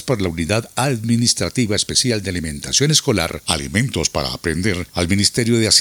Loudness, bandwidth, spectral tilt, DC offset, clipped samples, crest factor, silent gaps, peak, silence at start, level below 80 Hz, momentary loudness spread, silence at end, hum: -18 LUFS; over 20 kHz; -3.5 dB/octave; under 0.1%; under 0.1%; 18 dB; none; 0 dBFS; 0 s; -42 dBFS; 7 LU; 0 s; none